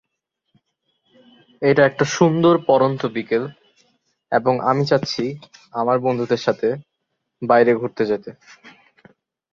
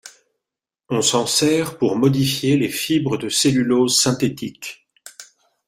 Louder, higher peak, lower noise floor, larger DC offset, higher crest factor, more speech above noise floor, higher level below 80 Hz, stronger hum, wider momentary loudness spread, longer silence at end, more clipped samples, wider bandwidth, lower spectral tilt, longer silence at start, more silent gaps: about the same, -19 LUFS vs -18 LUFS; about the same, -2 dBFS vs -4 dBFS; second, -77 dBFS vs -86 dBFS; neither; about the same, 18 dB vs 16 dB; second, 59 dB vs 68 dB; second, -62 dBFS vs -56 dBFS; neither; about the same, 13 LU vs 14 LU; first, 0.85 s vs 0.45 s; neither; second, 7.6 kHz vs 16 kHz; first, -6 dB/octave vs -4 dB/octave; first, 1.6 s vs 0.05 s; neither